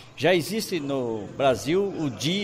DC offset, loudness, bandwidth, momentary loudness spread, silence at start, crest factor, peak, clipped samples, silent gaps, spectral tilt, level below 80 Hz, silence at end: under 0.1%; -25 LUFS; 16 kHz; 6 LU; 0 s; 16 dB; -10 dBFS; under 0.1%; none; -5 dB/octave; -58 dBFS; 0 s